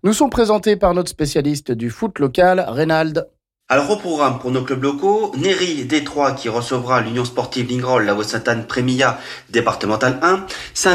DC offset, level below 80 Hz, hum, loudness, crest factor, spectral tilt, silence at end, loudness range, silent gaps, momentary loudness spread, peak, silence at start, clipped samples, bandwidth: under 0.1%; -44 dBFS; none; -18 LUFS; 12 dB; -4.5 dB/octave; 0 s; 2 LU; none; 7 LU; -4 dBFS; 0.05 s; under 0.1%; 16 kHz